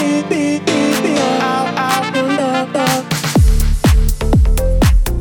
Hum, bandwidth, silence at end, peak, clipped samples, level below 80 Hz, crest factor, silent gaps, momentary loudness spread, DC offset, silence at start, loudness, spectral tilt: none; 19 kHz; 0 s; -2 dBFS; under 0.1%; -16 dBFS; 12 dB; none; 3 LU; under 0.1%; 0 s; -15 LUFS; -5.5 dB/octave